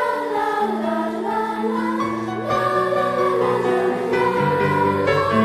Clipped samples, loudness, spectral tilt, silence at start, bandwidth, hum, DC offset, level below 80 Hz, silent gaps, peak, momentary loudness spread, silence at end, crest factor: under 0.1%; -20 LUFS; -6.5 dB/octave; 0 s; 14 kHz; none; under 0.1%; -54 dBFS; none; -6 dBFS; 5 LU; 0 s; 14 dB